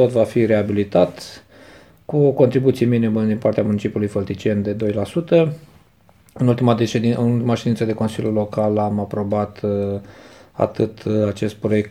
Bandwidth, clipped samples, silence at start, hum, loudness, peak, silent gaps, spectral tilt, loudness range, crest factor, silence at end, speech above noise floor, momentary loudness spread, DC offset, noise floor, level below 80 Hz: 14 kHz; under 0.1%; 0 s; none; -19 LUFS; 0 dBFS; none; -8 dB/octave; 3 LU; 18 dB; 0 s; 35 dB; 7 LU; 0.1%; -53 dBFS; -54 dBFS